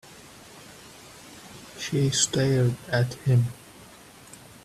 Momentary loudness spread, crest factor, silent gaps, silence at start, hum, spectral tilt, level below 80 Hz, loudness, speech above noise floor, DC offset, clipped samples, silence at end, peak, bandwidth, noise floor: 24 LU; 20 dB; none; 0.1 s; none; -4.5 dB/octave; -58 dBFS; -24 LUFS; 25 dB; under 0.1%; under 0.1%; 0.3 s; -6 dBFS; 14 kHz; -49 dBFS